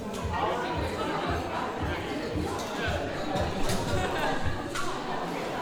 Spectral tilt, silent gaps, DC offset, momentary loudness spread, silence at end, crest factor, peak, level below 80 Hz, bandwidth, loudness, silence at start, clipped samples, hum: -5 dB/octave; none; under 0.1%; 3 LU; 0 s; 14 dB; -16 dBFS; -42 dBFS; 18 kHz; -31 LUFS; 0 s; under 0.1%; none